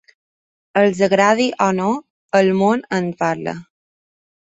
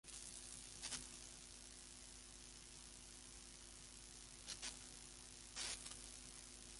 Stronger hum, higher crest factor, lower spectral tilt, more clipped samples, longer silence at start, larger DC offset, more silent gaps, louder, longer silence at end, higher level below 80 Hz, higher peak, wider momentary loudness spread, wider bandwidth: neither; second, 18 dB vs 24 dB; first, -5.5 dB/octave vs -0.5 dB/octave; neither; first, 0.75 s vs 0.05 s; neither; first, 2.10-2.29 s vs none; first, -17 LUFS vs -53 LUFS; first, 0.8 s vs 0 s; first, -60 dBFS vs -68 dBFS; first, 0 dBFS vs -32 dBFS; first, 11 LU vs 8 LU; second, 8 kHz vs 11.5 kHz